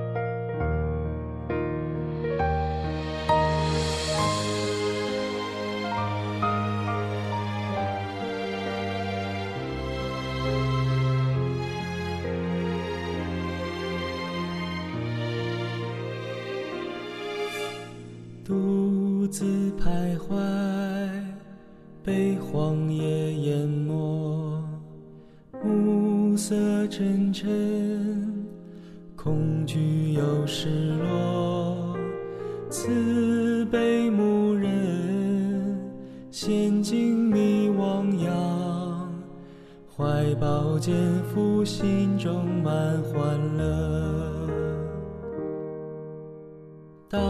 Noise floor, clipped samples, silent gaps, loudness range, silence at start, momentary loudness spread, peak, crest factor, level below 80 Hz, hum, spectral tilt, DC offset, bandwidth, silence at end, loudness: -48 dBFS; under 0.1%; none; 5 LU; 0 s; 11 LU; -10 dBFS; 16 dB; -46 dBFS; none; -6.5 dB/octave; under 0.1%; 13.5 kHz; 0 s; -27 LUFS